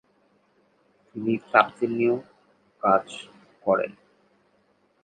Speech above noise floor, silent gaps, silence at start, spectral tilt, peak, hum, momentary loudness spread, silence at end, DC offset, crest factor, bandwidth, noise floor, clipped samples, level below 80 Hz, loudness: 42 dB; none; 1.15 s; -6 dB/octave; 0 dBFS; none; 19 LU; 1.15 s; under 0.1%; 26 dB; 9.2 kHz; -66 dBFS; under 0.1%; -72 dBFS; -24 LUFS